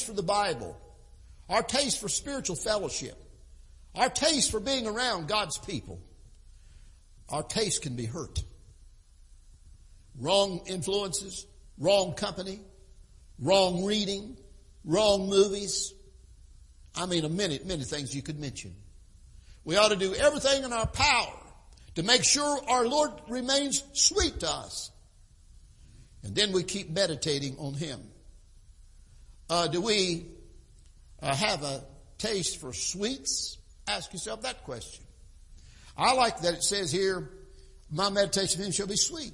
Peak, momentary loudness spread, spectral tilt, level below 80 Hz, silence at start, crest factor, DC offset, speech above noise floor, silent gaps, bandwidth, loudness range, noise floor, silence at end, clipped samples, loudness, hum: -6 dBFS; 15 LU; -2.5 dB/octave; -50 dBFS; 0 s; 24 dB; under 0.1%; 27 dB; none; 11.5 kHz; 8 LU; -56 dBFS; 0 s; under 0.1%; -28 LUFS; none